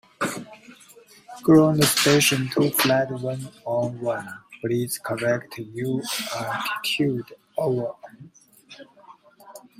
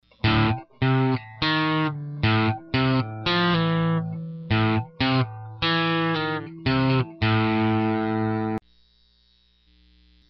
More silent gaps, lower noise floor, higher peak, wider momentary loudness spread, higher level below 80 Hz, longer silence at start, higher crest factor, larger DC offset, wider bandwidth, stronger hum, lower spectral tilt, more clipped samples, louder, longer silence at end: neither; second, -51 dBFS vs -62 dBFS; first, -4 dBFS vs -8 dBFS; first, 16 LU vs 6 LU; second, -62 dBFS vs -46 dBFS; about the same, 0.2 s vs 0.25 s; about the same, 20 dB vs 16 dB; neither; first, 16 kHz vs 6 kHz; second, none vs 60 Hz at -55 dBFS; second, -4 dB/octave vs -8.5 dB/octave; neither; about the same, -23 LUFS vs -23 LUFS; second, 0.2 s vs 1.7 s